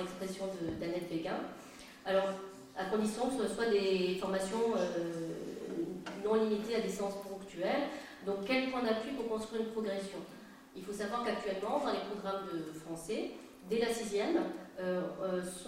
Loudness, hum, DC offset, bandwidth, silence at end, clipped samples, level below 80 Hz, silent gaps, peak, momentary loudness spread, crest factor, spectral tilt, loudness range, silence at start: -36 LUFS; none; under 0.1%; 16 kHz; 0 s; under 0.1%; -66 dBFS; none; -18 dBFS; 12 LU; 18 dB; -5 dB/octave; 4 LU; 0 s